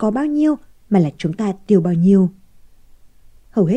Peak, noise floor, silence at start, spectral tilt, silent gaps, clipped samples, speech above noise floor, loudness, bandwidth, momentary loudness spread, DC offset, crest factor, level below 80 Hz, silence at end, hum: -2 dBFS; -45 dBFS; 0 s; -9 dB/octave; none; under 0.1%; 29 dB; -17 LUFS; 8.8 kHz; 9 LU; under 0.1%; 16 dB; -50 dBFS; 0 s; none